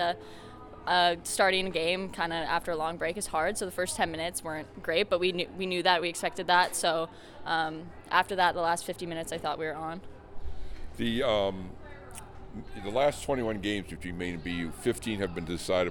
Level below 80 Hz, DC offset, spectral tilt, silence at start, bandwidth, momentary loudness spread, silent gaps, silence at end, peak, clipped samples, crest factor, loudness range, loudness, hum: -50 dBFS; under 0.1%; -3.5 dB/octave; 0 s; 19 kHz; 20 LU; none; 0 s; -8 dBFS; under 0.1%; 22 dB; 5 LU; -30 LUFS; none